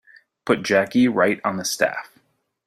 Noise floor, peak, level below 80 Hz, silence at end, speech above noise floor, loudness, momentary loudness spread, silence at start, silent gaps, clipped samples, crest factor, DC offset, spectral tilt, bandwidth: -63 dBFS; -4 dBFS; -62 dBFS; 0.6 s; 43 dB; -20 LUFS; 8 LU; 0.45 s; none; under 0.1%; 18 dB; under 0.1%; -4 dB/octave; 16 kHz